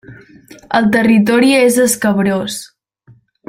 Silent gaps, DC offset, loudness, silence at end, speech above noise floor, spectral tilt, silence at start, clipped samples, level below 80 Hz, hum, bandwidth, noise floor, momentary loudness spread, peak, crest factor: none; under 0.1%; -12 LUFS; 0.85 s; 36 dB; -4.5 dB/octave; 0.1 s; under 0.1%; -52 dBFS; none; 16.5 kHz; -48 dBFS; 9 LU; 0 dBFS; 14 dB